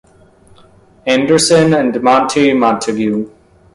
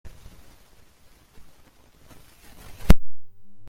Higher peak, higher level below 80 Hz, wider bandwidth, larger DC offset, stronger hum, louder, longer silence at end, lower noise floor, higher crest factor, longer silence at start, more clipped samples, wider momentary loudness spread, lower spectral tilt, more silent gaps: about the same, 0 dBFS vs 0 dBFS; second, -48 dBFS vs -30 dBFS; second, 11.5 kHz vs 16 kHz; neither; neither; first, -12 LUFS vs -24 LUFS; first, 0.45 s vs 0 s; second, -46 dBFS vs -54 dBFS; second, 14 dB vs 22 dB; first, 1.05 s vs 0.05 s; neither; second, 10 LU vs 28 LU; second, -4.5 dB/octave vs -6.5 dB/octave; neither